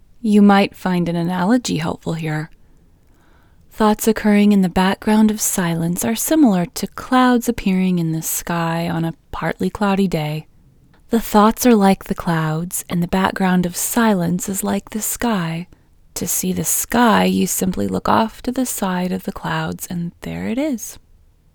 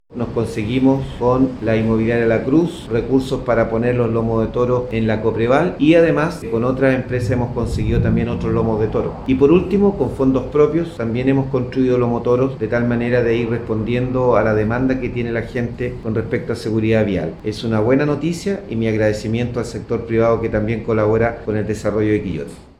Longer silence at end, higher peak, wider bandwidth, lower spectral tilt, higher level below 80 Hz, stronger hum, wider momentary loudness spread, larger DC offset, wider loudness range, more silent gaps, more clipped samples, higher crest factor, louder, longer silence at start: first, 0.6 s vs 0.2 s; about the same, 0 dBFS vs 0 dBFS; first, over 20 kHz vs 12 kHz; second, -5 dB/octave vs -8 dB/octave; second, -42 dBFS vs -36 dBFS; neither; first, 11 LU vs 7 LU; neither; about the same, 5 LU vs 3 LU; neither; neither; about the same, 18 dB vs 16 dB; about the same, -18 LUFS vs -18 LUFS; first, 0.25 s vs 0.1 s